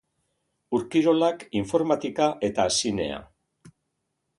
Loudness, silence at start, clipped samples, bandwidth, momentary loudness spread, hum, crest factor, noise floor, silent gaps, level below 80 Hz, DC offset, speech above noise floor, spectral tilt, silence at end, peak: -25 LUFS; 0.7 s; under 0.1%; 11.5 kHz; 8 LU; none; 18 dB; -78 dBFS; none; -56 dBFS; under 0.1%; 54 dB; -4 dB/octave; 1.15 s; -8 dBFS